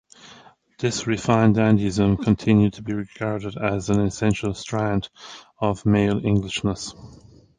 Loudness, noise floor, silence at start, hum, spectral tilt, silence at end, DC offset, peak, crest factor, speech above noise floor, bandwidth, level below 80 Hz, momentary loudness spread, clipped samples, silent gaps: -22 LUFS; -50 dBFS; 0.25 s; none; -6.5 dB/octave; 0.45 s; under 0.1%; -4 dBFS; 18 dB; 29 dB; 9.6 kHz; -44 dBFS; 11 LU; under 0.1%; none